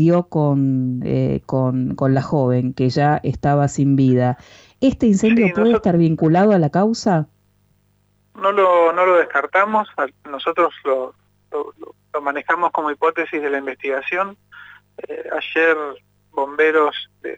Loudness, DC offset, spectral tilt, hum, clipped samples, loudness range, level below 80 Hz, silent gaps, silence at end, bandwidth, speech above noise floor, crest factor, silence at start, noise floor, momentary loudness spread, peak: -18 LUFS; under 0.1%; -7 dB/octave; 50 Hz at -45 dBFS; under 0.1%; 6 LU; -50 dBFS; none; 0 s; 8 kHz; 43 dB; 14 dB; 0 s; -61 dBFS; 12 LU; -4 dBFS